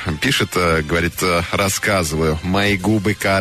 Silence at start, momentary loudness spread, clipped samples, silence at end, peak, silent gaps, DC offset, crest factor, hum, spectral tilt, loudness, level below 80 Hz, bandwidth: 0 s; 2 LU; under 0.1%; 0 s; -6 dBFS; none; under 0.1%; 12 dB; none; -4.5 dB/octave; -17 LUFS; -36 dBFS; 13.5 kHz